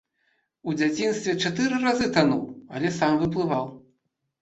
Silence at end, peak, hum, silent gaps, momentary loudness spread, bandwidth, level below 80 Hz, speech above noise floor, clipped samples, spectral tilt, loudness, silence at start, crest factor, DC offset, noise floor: 0.6 s; -4 dBFS; none; none; 9 LU; 8.2 kHz; -58 dBFS; 51 dB; under 0.1%; -5 dB/octave; -24 LUFS; 0.65 s; 22 dB; under 0.1%; -75 dBFS